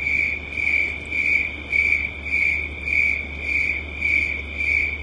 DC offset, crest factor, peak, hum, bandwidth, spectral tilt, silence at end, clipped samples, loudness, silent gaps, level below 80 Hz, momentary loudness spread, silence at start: under 0.1%; 14 dB; -8 dBFS; none; 10.5 kHz; -4 dB/octave; 0 s; under 0.1%; -20 LUFS; none; -38 dBFS; 5 LU; 0 s